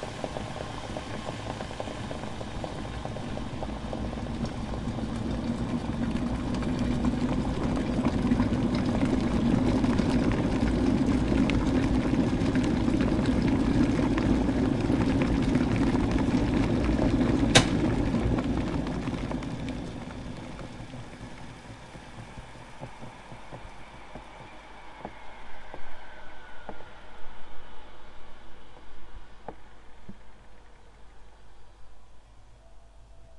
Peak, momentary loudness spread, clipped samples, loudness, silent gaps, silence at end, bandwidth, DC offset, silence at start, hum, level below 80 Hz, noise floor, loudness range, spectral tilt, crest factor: -2 dBFS; 21 LU; under 0.1%; -28 LUFS; none; 0 s; 11.5 kHz; under 0.1%; 0 s; none; -38 dBFS; -50 dBFS; 20 LU; -6 dB/octave; 26 dB